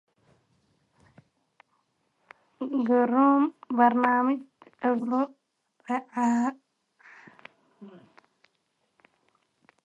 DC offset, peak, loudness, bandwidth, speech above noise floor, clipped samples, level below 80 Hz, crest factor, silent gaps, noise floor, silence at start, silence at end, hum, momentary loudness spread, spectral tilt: under 0.1%; -8 dBFS; -25 LUFS; 8.6 kHz; 51 dB; under 0.1%; -82 dBFS; 22 dB; none; -75 dBFS; 2.6 s; 1.95 s; none; 12 LU; -6.5 dB/octave